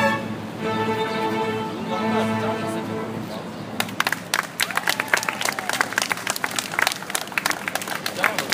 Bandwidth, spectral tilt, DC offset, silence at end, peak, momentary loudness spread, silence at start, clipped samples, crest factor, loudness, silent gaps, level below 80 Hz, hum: 16 kHz; -3 dB/octave; under 0.1%; 0 s; 0 dBFS; 7 LU; 0 s; under 0.1%; 24 dB; -24 LUFS; none; -62 dBFS; none